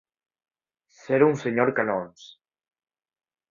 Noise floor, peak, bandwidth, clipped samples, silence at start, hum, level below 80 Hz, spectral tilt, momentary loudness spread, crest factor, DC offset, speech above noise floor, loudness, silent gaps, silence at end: -62 dBFS; -6 dBFS; 7.4 kHz; under 0.1%; 1.1 s; none; -70 dBFS; -7 dB/octave; 9 LU; 22 dB; under 0.1%; 39 dB; -23 LUFS; none; 1.25 s